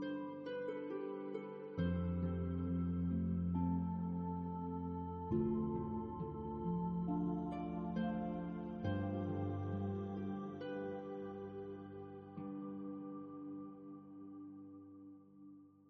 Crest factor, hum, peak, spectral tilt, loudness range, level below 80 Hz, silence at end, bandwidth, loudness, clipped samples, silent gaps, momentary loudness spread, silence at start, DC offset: 16 dB; none; -26 dBFS; -8.5 dB/octave; 10 LU; -64 dBFS; 0 s; 4.8 kHz; -42 LUFS; under 0.1%; none; 15 LU; 0 s; under 0.1%